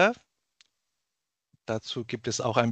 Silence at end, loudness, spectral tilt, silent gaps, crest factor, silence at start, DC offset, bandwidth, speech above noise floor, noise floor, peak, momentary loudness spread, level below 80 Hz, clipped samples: 0 s; -30 LUFS; -4.5 dB/octave; none; 26 dB; 0 s; under 0.1%; 9 kHz; 57 dB; -86 dBFS; -4 dBFS; 15 LU; -68 dBFS; under 0.1%